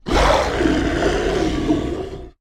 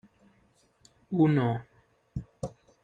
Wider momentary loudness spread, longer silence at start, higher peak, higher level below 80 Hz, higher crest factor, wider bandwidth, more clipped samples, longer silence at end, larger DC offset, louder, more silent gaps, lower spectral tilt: second, 10 LU vs 18 LU; second, 0.05 s vs 1.1 s; first, -4 dBFS vs -12 dBFS; first, -26 dBFS vs -56 dBFS; about the same, 16 dB vs 20 dB; first, 15.5 kHz vs 9.6 kHz; neither; second, 0.1 s vs 0.35 s; neither; first, -19 LUFS vs -29 LUFS; neither; second, -5.5 dB/octave vs -9 dB/octave